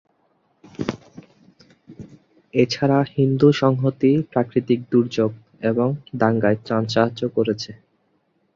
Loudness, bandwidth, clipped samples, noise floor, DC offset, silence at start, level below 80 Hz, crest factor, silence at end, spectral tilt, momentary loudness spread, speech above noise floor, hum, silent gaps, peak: -20 LUFS; 7.4 kHz; under 0.1%; -66 dBFS; under 0.1%; 0.8 s; -58 dBFS; 18 dB; 0.8 s; -7.5 dB/octave; 13 LU; 47 dB; none; none; -2 dBFS